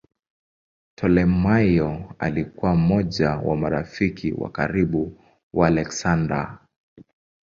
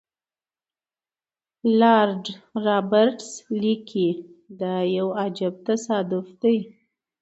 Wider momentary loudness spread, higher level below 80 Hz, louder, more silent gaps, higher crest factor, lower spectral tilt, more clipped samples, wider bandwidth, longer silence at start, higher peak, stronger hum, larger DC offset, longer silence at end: second, 9 LU vs 13 LU; first, -40 dBFS vs -74 dBFS; about the same, -22 LUFS vs -23 LUFS; first, 5.43-5.51 s vs none; about the same, 20 dB vs 20 dB; first, -7 dB/octave vs -5.5 dB/octave; neither; about the same, 7.6 kHz vs 8.2 kHz; second, 1 s vs 1.65 s; about the same, -4 dBFS vs -4 dBFS; neither; neither; first, 1 s vs 0.55 s